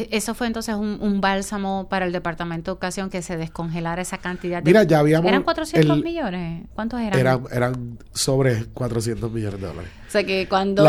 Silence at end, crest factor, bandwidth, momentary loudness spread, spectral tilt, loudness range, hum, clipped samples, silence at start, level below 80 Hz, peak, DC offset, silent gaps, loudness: 0 s; 20 dB; 15.5 kHz; 12 LU; -5.5 dB/octave; 6 LU; none; under 0.1%; 0 s; -44 dBFS; -2 dBFS; under 0.1%; none; -22 LUFS